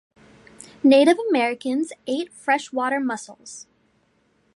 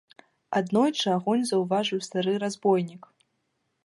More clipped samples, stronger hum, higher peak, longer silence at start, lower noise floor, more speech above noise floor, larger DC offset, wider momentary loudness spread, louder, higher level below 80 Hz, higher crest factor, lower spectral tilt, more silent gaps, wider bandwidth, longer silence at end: neither; neither; first, -4 dBFS vs -10 dBFS; first, 0.85 s vs 0.5 s; second, -64 dBFS vs -76 dBFS; second, 43 dB vs 51 dB; neither; first, 22 LU vs 5 LU; first, -21 LUFS vs -26 LUFS; about the same, -72 dBFS vs -76 dBFS; about the same, 18 dB vs 18 dB; second, -3.5 dB/octave vs -5 dB/octave; neither; about the same, 11.5 kHz vs 11.5 kHz; about the same, 0.95 s vs 0.85 s